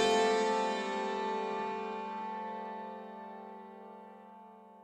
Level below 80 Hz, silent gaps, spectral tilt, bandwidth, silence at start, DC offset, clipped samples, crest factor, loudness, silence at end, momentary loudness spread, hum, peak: -74 dBFS; none; -3.5 dB/octave; 11.5 kHz; 0 s; under 0.1%; under 0.1%; 18 dB; -35 LUFS; 0 s; 23 LU; none; -16 dBFS